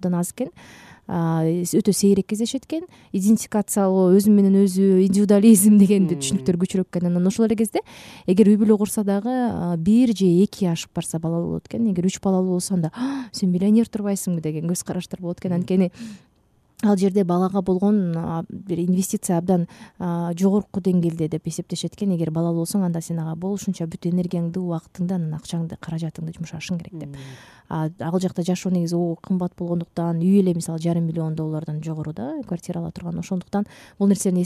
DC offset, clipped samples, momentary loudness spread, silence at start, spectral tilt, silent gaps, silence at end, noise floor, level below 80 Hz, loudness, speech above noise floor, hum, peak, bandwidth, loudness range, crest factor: under 0.1%; under 0.1%; 13 LU; 0 s; -6.5 dB/octave; none; 0 s; -61 dBFS; -56 dBFS; -21 LUFS; 40 dB; none; -4 dBFS; 15 kHz; 10 LU; 18 dB